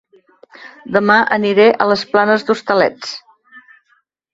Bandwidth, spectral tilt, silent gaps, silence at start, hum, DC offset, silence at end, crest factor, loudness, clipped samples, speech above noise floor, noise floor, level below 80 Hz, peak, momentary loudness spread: 7.8 kHz; -5 dB/octave; none; 0.6 s; none; under 0.1%; 0.75 s; 16 dB; -13 LUFS; under 0.1%; 47 dB; -60 dBFS; -60 dBFS; 0 dBFS; 16 LU